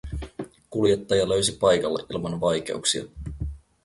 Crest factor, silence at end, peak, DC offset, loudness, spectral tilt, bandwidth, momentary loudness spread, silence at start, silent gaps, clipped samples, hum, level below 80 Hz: 18 dB; 0.25 s; -6 dBFS; under 0.1%; -24 LUFS; -4 dB/octave; 11.5 kHz; 15 LU; 0.05 s; none; under 0.1%; none; -42 dBFS